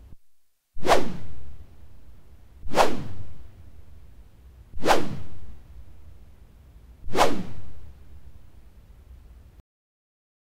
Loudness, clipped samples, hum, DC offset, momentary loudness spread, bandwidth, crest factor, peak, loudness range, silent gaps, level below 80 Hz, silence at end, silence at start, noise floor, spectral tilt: -26 LUFS; under 0.1%; none; under 0.1%; 27 LU; 16 kHz; 20 dB; -4 dBFS; 3 LU; none; -44 dBFS; 1.95 s; 0.1 s; -55 dBFS; -4 dB/octave